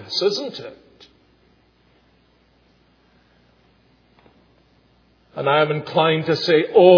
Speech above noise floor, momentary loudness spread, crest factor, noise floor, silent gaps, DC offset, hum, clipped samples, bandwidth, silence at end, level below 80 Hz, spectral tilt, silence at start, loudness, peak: 42 dB; 19 LU; 22 dB; -58 dBFS; none; under 0.1%; none; under 0.1%; 5.4 kHz; 0 s; -66 dBFS; -6 dB/octave; 0 s; -19 LUFS; 0 dBFS